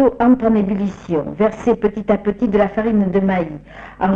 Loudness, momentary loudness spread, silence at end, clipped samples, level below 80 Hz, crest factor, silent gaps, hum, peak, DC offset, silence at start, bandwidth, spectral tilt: -17 LUFS; 8 LU; 0 s; under 0.1%; -42 dBFS; 14 dB; none; none; -4 dBFS; under 0.1%; 0 s; 7.4 kHz; -9 dB/octave